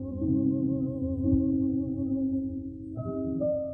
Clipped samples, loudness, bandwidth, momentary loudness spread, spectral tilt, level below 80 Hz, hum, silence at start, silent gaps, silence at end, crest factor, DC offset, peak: under 0.1%; -29 LUFS; 1.4 kHz; 9 LU; -15 dB/octave; -44 dBFS; none; 0 s; none; 0 s; 14 dB; under 0.1%; -14 dBFS